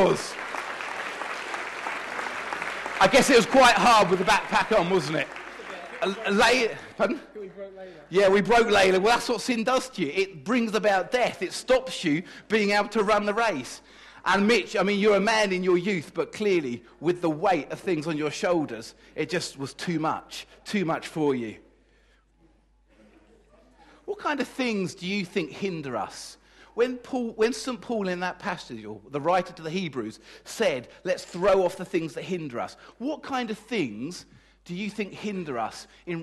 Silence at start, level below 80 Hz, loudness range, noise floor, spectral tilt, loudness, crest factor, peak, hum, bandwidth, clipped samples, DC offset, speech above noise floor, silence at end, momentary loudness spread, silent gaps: 0 s; -56 dBFS; 11 LU; -61 dBFS; -4 dB/octave; -25 LUFS; 18 dB; -8 dBFS; none; 12.5 kHz; under 0.1%; under 0.1%; 36 dB; 0 s; 16 LU; none